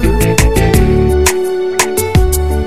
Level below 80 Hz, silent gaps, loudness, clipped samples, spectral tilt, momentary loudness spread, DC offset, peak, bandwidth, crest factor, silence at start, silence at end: -16 dBFS; none; -12 LUFS; under 0.1%; -5 dB/octave; 3 LU; 4%; 0 dBFS; 16.5 kHz; 10 dB; 0 s; 0 s